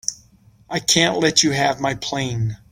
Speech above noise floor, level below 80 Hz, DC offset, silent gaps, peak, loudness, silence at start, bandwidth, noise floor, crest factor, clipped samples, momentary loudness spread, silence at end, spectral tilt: 33 dB; -50 dBFS; under 0.1%; none; 0 dBFS; -19 LUFS; 0.1 s; 16.5 kHz; -52 dBFS; 20 dB; under 0.1%; 10 LU; 0.15 s; -3 dB/octave